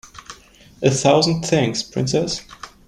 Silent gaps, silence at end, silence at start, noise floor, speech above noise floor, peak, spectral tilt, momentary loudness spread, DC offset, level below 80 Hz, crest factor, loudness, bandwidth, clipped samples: none; 0.2 s; 0.05 s; -47 dBFS; 29 dB; -2 dBFS; -4.5 dB/octave; 22 LU; under 0.1%; -50 dBFS; 18 dB; -19 LUFS; 13 kHz; under 0.1%